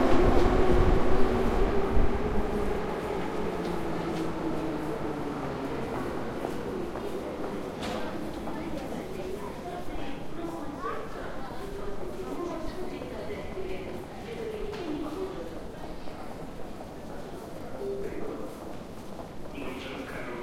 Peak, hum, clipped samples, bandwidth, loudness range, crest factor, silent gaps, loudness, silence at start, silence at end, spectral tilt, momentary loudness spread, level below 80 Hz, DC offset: -8 dBFS; none; under 0.1%; 14.5 kHz; 10 LU; 20 dB; none; -33 LUFS; 0 s; 0 s; -6.5 dB/octave; 14 LU; -36 dBFS; under 0.1%